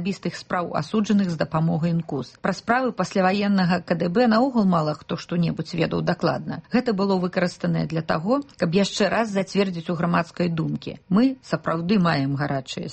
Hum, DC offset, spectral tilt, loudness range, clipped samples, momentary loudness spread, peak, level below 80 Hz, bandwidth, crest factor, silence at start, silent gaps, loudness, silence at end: none; under 0.1%; -6.5 dB/octave; 2 LU; under 0.1%; 7 LU; -6 dBFS; -56 dBFS; 8.4 kHz; 16 dB; 0 s; none; -23 LUFS; 0 s